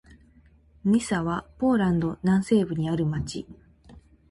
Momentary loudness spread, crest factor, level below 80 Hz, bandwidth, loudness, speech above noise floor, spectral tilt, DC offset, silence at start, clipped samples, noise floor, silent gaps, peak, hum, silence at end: 10 LU; 16 dB; -50 dBFS; 11.5 kHz; -25 LUFS; 33 dB; -7 dB/octave; under 0.1%; 0.85 s; under 0.1%; -57 dBFS; none; -10 dBFS; none; 0.3 s